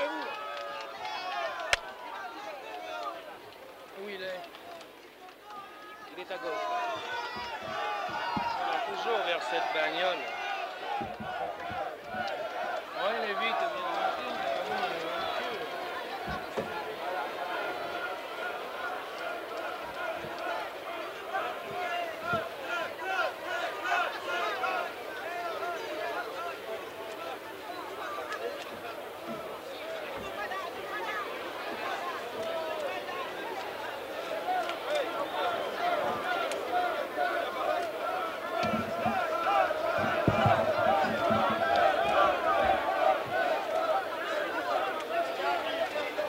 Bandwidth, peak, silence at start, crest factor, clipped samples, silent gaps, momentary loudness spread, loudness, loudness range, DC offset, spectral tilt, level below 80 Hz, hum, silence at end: 16 kHz; -8 dBFS; 0 s; 26 dB; under 0.1%; none; 12 LU; -32 LUFS; 10 LU; under 0.1%; -4 dB/octave; -64 dBFS; none; 0 s